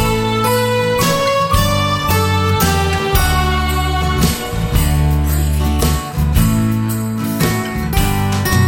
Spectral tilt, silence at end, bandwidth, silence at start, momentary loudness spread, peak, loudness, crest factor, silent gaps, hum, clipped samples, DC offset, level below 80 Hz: -5 dB/octave; 0 s; 17 kHz; 0 s; 4 LU; -2 dBFS; -15 LUFS; 14 dB; none; none; under 0.1%; under 0.1%; -20 dBFS